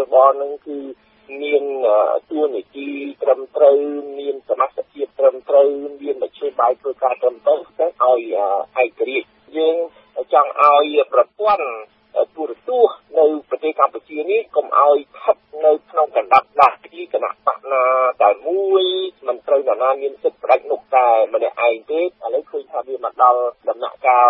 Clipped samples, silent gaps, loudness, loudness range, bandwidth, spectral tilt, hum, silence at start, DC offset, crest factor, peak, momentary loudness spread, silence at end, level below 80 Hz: under 0.1%; none; -18 LUFS; 2 LU; 5.6 kHz; -5 dB/octave; none; 0 s; under 0.1%; 18 dB; 0 dBFS; 12 LU; 0 s; -70 dBFS